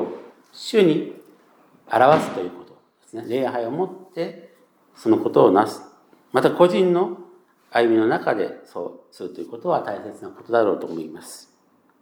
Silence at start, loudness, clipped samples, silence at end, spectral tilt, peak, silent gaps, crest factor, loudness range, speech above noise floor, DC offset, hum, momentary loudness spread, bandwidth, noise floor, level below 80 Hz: 0 s; -21 LUFS; under 0.1%; 0.6 s; -6.5 dB/octave; -2 dBFS; none; 20 dB; 6 LU; 40 dB; under 0.1%; none; 20 LU; 17 kHz; -60 dBFS; -78 dBFS